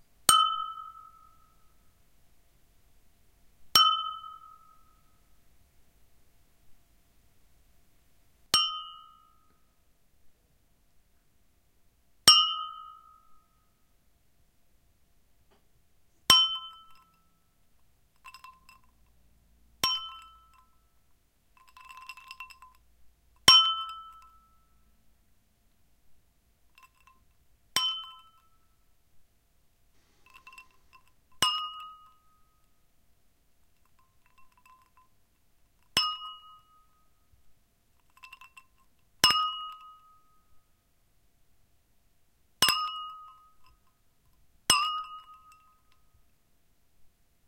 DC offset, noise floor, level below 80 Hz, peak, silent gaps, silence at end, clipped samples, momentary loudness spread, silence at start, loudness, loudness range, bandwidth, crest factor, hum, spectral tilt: under 0.1%; -70 dBFS; -66 dBFS; 0 dBFS; none; 2.3 s; under 0.1%; 28 LU; 0.3 s; -24 LUFS; 11 LU; 16 kHz; 34 dB; none; 0.5 dB/octave